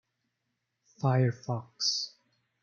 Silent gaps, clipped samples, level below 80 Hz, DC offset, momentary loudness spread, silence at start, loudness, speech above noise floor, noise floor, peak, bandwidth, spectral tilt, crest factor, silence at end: none; under 0.1%; -76 dBFS; under 0.1%; 10 LU; 1 s; -30 LUFS; 53 dB; -82 dBFS; -14 dBFS; 7.2 kHz; -4.5 dB/octave; 20 dB; 0.55 s